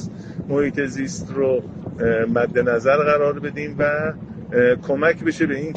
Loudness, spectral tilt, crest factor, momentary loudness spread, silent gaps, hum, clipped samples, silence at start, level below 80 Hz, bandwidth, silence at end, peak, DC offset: -20 LUFS; -6.5 dB/octave; 16 dB; 10 LU; none; none; under 0.1%; 0 s; -48 dBFS; 8.8 kHz; 0 s; -4 dBFS; under 0.1%